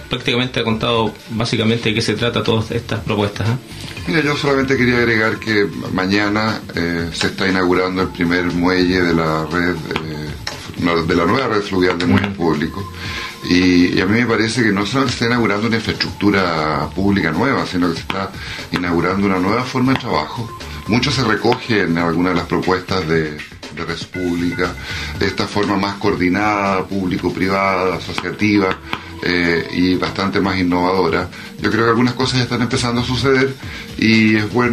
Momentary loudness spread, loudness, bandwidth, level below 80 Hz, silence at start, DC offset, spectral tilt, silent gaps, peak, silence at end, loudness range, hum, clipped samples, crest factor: 9 LU; -17 LUFS; 13.5 kHz; -40 dBFS; 0 s; under 0.1%; -5.5 dB/octave; none; -2 dBFS; 0 s; 3 LU; none; under 0.1%; 14 dB